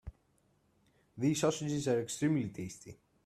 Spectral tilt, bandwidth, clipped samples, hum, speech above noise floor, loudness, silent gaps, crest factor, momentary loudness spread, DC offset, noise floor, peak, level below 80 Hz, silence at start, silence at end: -5.5 dB/octave; 14 kHz; under 0.1%; none; 39 dB; -34 LUFS; none; 18 dB; 20 LU; under 0.1%; -73 dBFS; -18 dBFS; -62 dBFS; 0.05 s; 0.3 s